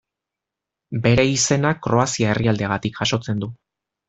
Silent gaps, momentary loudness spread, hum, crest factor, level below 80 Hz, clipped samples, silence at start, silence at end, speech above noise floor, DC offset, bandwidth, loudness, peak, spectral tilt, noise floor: none; 10 LU; none; 18 dB; -48 dBFS; under 0.1%; 0.9 s; 0.55 s; 66 dB; under 0.1%; 8.4 kHz; -20 LUFS; -4 dBFS; -4.5 dB/octave; -85 dBFS